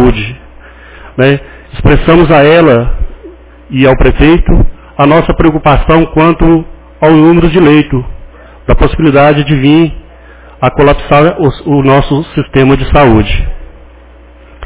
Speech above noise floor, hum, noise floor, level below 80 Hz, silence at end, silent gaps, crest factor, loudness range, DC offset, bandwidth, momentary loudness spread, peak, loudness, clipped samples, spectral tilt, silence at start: 29 dB; none; -35 dBFS; -18 dBFS; 0 s; none; 8 dB; 2 LU; under 0.1%; 4 kHz; 12 LU; 0 dBFS; -7 LUFS; 3%; -11 dB/octave; 0 s